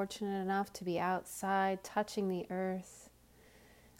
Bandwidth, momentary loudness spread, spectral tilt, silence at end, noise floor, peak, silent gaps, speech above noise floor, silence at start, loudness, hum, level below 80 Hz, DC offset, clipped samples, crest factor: 16 kHz; 7 LU; -5 dB/octave; 0.9 s; -63 dBFS; -22 dBFS; none; 26 dB; 0 s; -37 LUFS; none; -70 dBFS; under 0.1%; under 0.1%; 16 dB